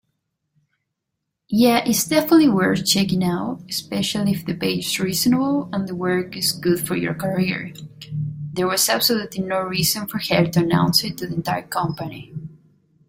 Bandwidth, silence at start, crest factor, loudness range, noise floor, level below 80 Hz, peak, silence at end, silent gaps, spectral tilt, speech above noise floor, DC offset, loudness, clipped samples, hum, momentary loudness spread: 16.5 kHz; 1.5 s; 18 dB; 3 LU; -79 dBFS; -54 dBFS; -2 dBFS; 0.55 s; none; -4.5 dB/octave; 59 dB; under 0.1%; -20 LUFS; under 0.1%; none; 12 LU